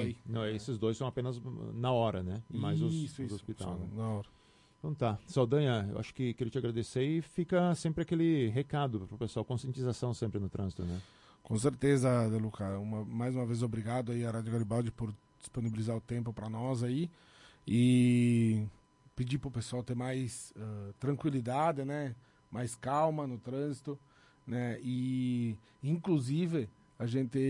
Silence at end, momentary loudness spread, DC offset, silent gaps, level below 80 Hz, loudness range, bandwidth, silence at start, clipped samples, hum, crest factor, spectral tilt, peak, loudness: 0 s; 12 LU; under 0.1%; none; -62 dBFS; 5 LU; 11.5 kHz; 0 s; under 0.1%; none; 18 dB; -7 dB/octave; -16 dBFS; -35 LUFS